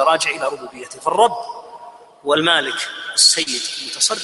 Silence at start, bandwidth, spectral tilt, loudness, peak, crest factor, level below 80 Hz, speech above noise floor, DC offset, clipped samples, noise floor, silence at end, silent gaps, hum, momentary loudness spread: 0 s; 11.5 kHz; -0.5 dB/octave; -17 LUFS; 0 dBFS; 20 dB; -66 dBFS; 21 dB; under 0.1%; under 0.1%; -40 dBFS; 0 s; none; none; 18 LU